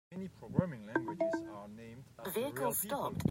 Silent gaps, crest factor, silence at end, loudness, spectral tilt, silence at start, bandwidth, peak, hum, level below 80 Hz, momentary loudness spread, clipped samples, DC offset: none; 22 dB; 0 s; -37 LUFS; -5.5 dB/octave; 0.1 s; 16 kHz; -16 dBFS; none; -64 dBFS; 14 LU; under 0.1%; under 0.1%